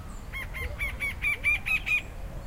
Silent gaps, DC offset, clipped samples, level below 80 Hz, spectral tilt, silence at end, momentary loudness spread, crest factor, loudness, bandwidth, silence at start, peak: none; under 0.1%; under 0.1%; -40 dBFS; -3.5 dB/octave; 0 s; 13 LU; 14 dB; -28 LUFS; 16 kHz; 0 s; -16 dBFS